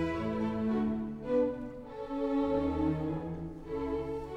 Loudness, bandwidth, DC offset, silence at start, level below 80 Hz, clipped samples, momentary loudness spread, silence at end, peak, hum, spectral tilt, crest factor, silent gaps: -34 LUFS; 9 kHz; under 0.1%; 0 s; -50 dBFS; under 0.1%; 10 LU; 0 s; -20 dBFS; none; -9 dB/octave; 14 dB; none